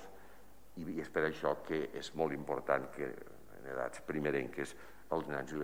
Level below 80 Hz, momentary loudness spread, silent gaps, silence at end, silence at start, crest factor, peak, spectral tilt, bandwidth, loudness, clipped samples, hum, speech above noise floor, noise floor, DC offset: -66 dBFS; 17 LU; none; 0 s; 0 s; 22 dB; -16 dBFS; -5.5 dB/octave; 16.5 kHz; -39 LUFS; under 0.1%; none; 23 dB; -61 dBFS; 0.3%